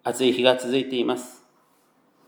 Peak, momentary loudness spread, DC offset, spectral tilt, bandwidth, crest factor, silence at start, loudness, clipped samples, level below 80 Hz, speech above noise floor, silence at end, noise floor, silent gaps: -2 dBFS; 11 LU; under 0.1%; -4 dB/octave; over 20 kHz; 22 dB; 0.05 s; -23 LUFS; under 0.1%; -84 dBFS; 40 dB; 0.95 s; -63 dBFS; none